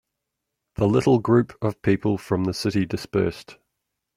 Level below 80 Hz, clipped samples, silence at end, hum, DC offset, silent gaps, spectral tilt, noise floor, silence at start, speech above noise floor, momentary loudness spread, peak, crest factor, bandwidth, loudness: -52 dBFS; under 0.1%; 0.65 s; none; under 0.1%; none; -7 dB/octave; -82 dBFS; 0.8 s; 60 dB; 9 LU; -6 dBFS; 18 dB; 15.5 kHz; -23 LUFS